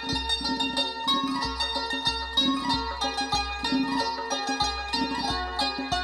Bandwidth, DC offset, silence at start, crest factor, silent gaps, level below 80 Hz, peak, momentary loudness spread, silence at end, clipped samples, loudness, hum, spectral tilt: 14 kHz; under 0.1%; 0 s; 16 dB; none; -44 dBFS; -12 dBFS; 4 LU; 0 s; under 0.1%; -26 LUFS; none; -3 dB/octave